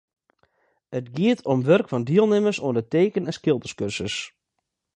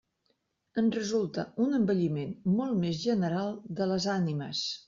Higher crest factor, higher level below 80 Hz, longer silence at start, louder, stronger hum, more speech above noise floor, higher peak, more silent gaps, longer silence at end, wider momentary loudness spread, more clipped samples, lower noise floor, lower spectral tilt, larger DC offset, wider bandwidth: about the same, 18 dB vs 14 dB; first, -60 dBFS vs -68 dBFS; first, 0.9 s vs 0.75 s; first, -23 LUFS vs -30 LUFS; neither; first, 58 dB vs 47 dB; first, -4 dBFS vs -16 dBFS; neither; first, 0.65 s vs 0.05 s; first, 12 LU vs 6 LU; neither; first, -80 dBFS vs -76 dBFS; about the same, -6 dB/octave vs -6 dB/octave; neither; first, 10 kHz vs 7.4 kHz